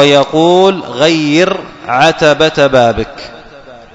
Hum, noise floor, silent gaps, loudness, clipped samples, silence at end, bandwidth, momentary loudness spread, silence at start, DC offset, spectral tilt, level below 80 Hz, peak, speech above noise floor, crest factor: none; -34 dBFS; none; -10 LUFS; 0.6%; 0.2 s; 11 kHz; 12 LU; 0 s; under 0.1%; -5 dB/octave; -40 dBFS; 0 dBFS; 25 dB; 10 dB